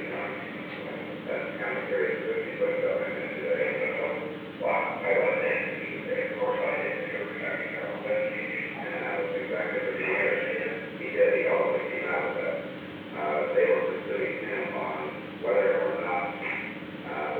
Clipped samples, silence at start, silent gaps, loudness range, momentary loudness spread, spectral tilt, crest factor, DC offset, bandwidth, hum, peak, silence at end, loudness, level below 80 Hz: under 0.1%; 0 s; none; 3 LU; 10 LU; -7 dB/octave; 18 dB; under 0.1%; 4.6 kHz; none; -12 dBFS; 0 s; -29 LUFS; -72 dBFS